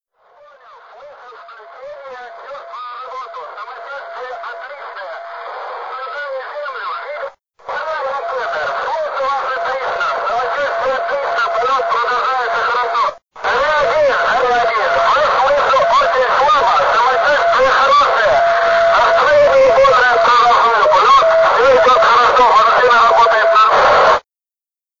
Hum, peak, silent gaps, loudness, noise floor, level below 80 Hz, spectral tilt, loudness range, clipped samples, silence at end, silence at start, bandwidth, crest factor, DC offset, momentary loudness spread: none; -2 dBFS; none; -12 LUFS; under -90 dBFS; -48 dBFS; -2 dB/octave; 19 LU; under 0.1%; 0.8 s; 1 s; 7.6 kHz; 12 dB; 0.3%; 19 LU